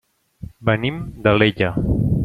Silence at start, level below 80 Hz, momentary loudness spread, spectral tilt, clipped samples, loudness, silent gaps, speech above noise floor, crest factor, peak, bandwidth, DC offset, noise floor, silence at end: 0.4 s; -34 dBFS; 14 LU; -8.5 dB/octave; under 0.1%; -19 LUFS; none; 20 dB; 18 dB; -2 dBFS; 4.9 kHz; under 0.1%; -38 dBFS; 0 s